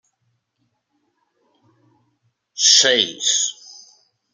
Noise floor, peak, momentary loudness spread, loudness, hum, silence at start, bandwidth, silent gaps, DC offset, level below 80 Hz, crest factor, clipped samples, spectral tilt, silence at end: -71 dBFS; 0 dBFS; 12 LU; -14 LUFS; none; 2.55 s; 13 kHz; none; under 0.1%; -80 dBFS; 22 dB; under 0.1%; 1.5 dB/octave; 0.8 s